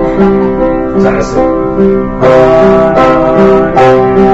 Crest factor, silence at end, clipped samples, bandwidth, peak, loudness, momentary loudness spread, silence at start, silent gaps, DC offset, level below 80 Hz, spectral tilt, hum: 6 dB; 0 s; 3%; 8 kHz; 0 dBFS; -7 LUFS; 5 LU; 0 s; none; under 0.1%; -26 dBFS; -7.5 dB/octave; none